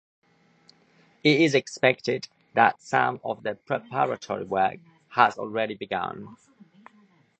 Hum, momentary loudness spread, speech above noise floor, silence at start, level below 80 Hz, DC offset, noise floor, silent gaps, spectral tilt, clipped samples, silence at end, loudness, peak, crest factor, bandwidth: none; 11 LU; 36 dB; 1.25 s; -70 dBFS; under 0.1%; -61 dBFS; none; -5 dB/octave; under 0.1%; 1.05 s; -25 LUFS; -2 dBFS; 24 dB; 8.8 kHz